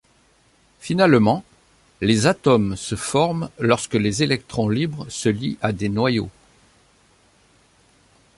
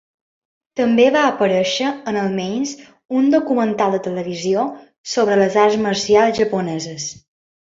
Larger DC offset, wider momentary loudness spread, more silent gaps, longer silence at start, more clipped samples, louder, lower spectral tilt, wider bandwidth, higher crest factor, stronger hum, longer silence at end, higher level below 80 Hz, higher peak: neither; second, 9 LU vs 12 LU; second, none vs 3.05-3.09 s, 4.98-5.04 s; about the same, 0.85 s vs 0.75 s; neither; about the same, -20 LUFS vs -18 LUFS; about the same, -5.5 dB/octave vs -4.5 dB/octave; first, 11.5 kHz vs 7.8 kHz; about the same, 20 dB vs 16 dB; neither; first, 2.1 s vs 0.55 s; first, -50 dBFS vs -58 dBFS; about the same, -2 dBFS vs -2 dBFS